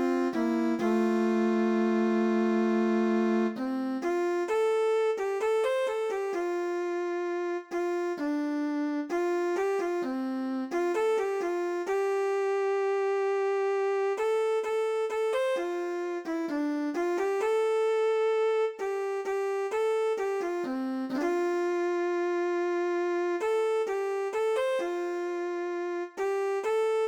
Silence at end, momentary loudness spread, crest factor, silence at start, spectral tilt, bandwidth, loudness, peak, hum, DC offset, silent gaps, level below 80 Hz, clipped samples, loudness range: 0 s; 6 LU; 12 dB; 0 s; -5.5 dB/octave; 12 kHz; -29 LUFS; -16 dBFS; none; under 0.1%; none; -74 dBFS; under 0.1%; 3 LU